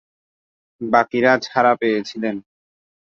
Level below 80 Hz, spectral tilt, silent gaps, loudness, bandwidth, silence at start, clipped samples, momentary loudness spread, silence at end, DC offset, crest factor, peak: -64 dBFS; -5.5 dB/octave; none; -18 LUFS; 7.4 kHz; 0.8 s; under 0.1%; 11 LU; 0.65 s; under 0.1%; 18 dB; -2 dBFS